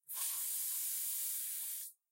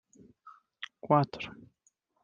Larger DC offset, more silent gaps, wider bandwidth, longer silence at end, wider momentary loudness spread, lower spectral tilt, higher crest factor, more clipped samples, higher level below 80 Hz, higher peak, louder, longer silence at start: neither; neither; first, 16 kHz vs 7.2 kHz; second, 0.2 s vs 0.7 s; second, 5 LU vs 18 LU; second, 6.5 dB/octave vs -7.5 dB/octave; second, 16 dB vs 24 dB; neither; second, under -90 dBFS vs -72 dBFS; second, -26 dBFS vs -10 dBFS; second, -37 LUFS vs -30 LUFS; second, 0.1 s vs 0.45 s